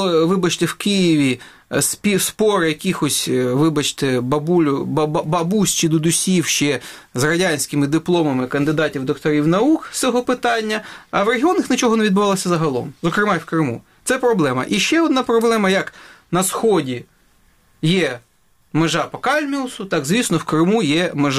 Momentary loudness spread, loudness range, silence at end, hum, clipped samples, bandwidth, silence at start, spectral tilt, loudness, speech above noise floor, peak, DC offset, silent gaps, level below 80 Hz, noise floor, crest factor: 7 LU; 3 LU; 0 s; none; under 0.1%; 16 kHz; 0 s; -4.5 dB/octave; -18 LUFS; 38 dB; -2 dBFS; under 0.1%; none; -54 dBFS; -56 dBFS; 16 dB